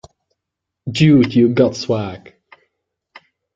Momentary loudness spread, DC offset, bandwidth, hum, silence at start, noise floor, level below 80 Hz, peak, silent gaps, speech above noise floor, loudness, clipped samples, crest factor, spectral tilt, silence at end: 18 LU; under 0.1%; 7.8 kHz; none; 0.85 s; -81 dBFS; -52 dBFS; -2 dBFS; none; 66 dB; -15 LUFS; under 0.1%; 16 dB; -7 dB/octave; 1.4 s